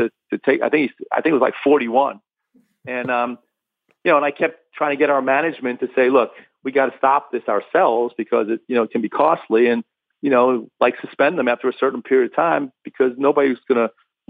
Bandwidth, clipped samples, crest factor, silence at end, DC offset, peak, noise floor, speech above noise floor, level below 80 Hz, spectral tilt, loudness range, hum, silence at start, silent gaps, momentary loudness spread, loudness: 4.8 kHz; under 0.1%; 16 dB; 0.4 s; under 0.1%; -4 dBFS; -68 dBFS; 50 dB; -72 dBFS; -8 dB/octave; 2 LU; none; 0 s; none; 7 LU; -19 LUFS